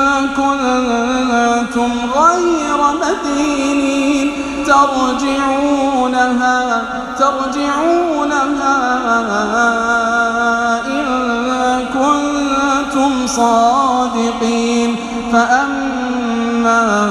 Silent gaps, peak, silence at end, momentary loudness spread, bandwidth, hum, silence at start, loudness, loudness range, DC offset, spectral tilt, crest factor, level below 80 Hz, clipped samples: none; 0 dBFS; 0 s; 5 LU; 12.5 kHz; none; 0 s; -14 LUFS; 1 LU; under 0.1%; -3.5 dB/octave; 14 dB; -42 dBFS; under 0.1%